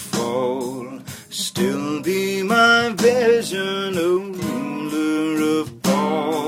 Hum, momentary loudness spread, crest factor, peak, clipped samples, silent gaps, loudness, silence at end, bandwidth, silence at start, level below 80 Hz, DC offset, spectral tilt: none; 11 LU; 18 dB; -2 dBFS; under 0.1%; none; -20 LUFS; 0 s; 16.5 kHz; 0 s; -60 dBFS; under 0.1%; -4.5 dB/octave